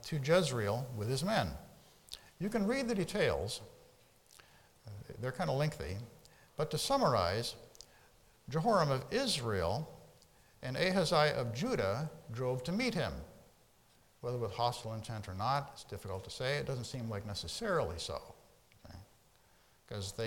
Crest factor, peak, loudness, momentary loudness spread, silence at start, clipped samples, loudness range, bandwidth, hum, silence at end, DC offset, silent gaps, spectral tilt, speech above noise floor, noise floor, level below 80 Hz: 20 dB; -16 dBFS; -35 LUFS; 19 LU; 0 s; under 0.1%; 6 LU; 18 kHz; none; 0 s; under 0.1%; none; -5 dB/octave; 32 dB; -68 dBFS; -60 dBFS